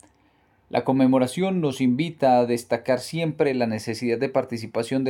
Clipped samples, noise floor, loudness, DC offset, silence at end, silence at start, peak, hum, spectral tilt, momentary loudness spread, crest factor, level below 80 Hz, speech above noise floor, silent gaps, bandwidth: under 0.1%; -62 dBFS; -23 LUFS; under 0.1%; 0 s; 0.75 s; -6 dBFS; none; -6.5 dB/octave; 8 LU; 16 dB; -64 dBFS; 39 dB; none; 13 kHz